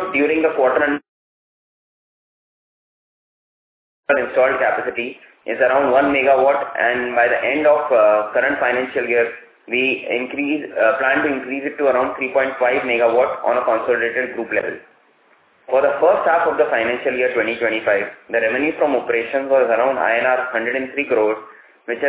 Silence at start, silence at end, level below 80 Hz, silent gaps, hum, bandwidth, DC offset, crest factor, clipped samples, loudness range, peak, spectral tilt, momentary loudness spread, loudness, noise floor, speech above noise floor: 0 s; 0 s; -60 dBFS; 1.08-4.03 s; none; 4 kHz; under 0.1%; 16 dB; under 0.1%; 6 LU; -2 dBFS; -8 dB/octave; 8 LU; -18 LUFS; -56 dBFS; 38 dB